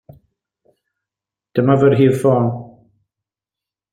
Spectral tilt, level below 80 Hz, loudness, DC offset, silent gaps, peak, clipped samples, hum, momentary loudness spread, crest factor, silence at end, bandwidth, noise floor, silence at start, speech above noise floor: -8.5 dB/octave; -58 dBFS; -15 LUFS; under 0.1%; none; -2 dBFS; under 0.1%; none; 11 LU; 18 dB; 1.25 s; 14 kHz; -88 dBFS; 1.55 s; 74 dB